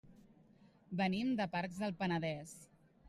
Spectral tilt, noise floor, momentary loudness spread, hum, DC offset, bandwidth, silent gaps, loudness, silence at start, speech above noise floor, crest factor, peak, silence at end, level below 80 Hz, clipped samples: -6 dB/octave; -66 dBFS; 12 LU; none; under 0.1%; 13 kHz; none; -38 LUFS; 0.05 s; 28 dB; 18 dB; -24 dBFS; 0 s; -72 dBFS; under 0.1%